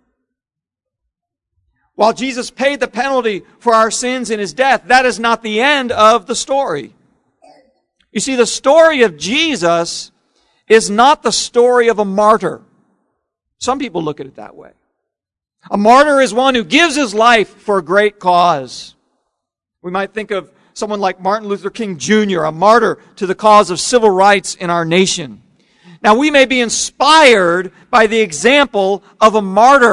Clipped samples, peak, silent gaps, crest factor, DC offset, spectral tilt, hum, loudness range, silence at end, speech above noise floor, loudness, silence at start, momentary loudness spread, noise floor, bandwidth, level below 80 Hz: 0.5%; 0 dBFS; none; 14 dB; under 0.1%; -3 dB/octave; none; 7 LU; 0 s; 73 dB; -12 LUFS; 2 s; 13 LU; -85 dBFS; 12 kHz; -50 dBFS